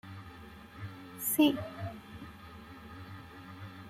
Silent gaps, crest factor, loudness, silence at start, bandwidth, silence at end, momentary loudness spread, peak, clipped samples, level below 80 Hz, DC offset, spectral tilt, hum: none; 22 dB; -31 LUFS; 0.05 s; 16 kHz; 0 s; 22 LU; -14 dBFS; under 0.1%; -62 dBFS; under 0.1%; -4.5 dB/octave; none